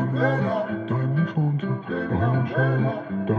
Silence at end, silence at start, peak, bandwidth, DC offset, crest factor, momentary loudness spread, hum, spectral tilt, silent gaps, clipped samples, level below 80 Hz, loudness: 0 s; 0 s; -8 dBFS; 4.6 kHz; under 0.1%; 14 dB; 5 LU; none; -10 dB/octave; none; under 0.1%; -60 dBFS; -24 LUFS